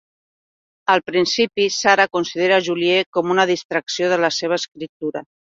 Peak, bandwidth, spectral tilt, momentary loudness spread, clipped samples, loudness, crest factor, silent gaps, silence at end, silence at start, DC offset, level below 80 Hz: 0 dBFS; 7.8 kHz; -3.5 dB/octave; 11 LU; under 0.1%; -18 LUFS; 18 dB; 3.06-3.13 s, 3.65-3.69 s, 4.89-5.00 s; 0.2 s; 0.9 s; under 0.1%; -64 dBFS